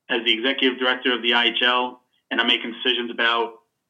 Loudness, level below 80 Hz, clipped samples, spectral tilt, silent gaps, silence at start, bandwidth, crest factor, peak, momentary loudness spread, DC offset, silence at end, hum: -20 LUFS; -84 dBFS; under 0.1%; -3 dB/octave; none; 0.1 s; 8.4 kHz; 18 dB; -4 dBFS; 7 LU; under 0.1%; 0.35 s; none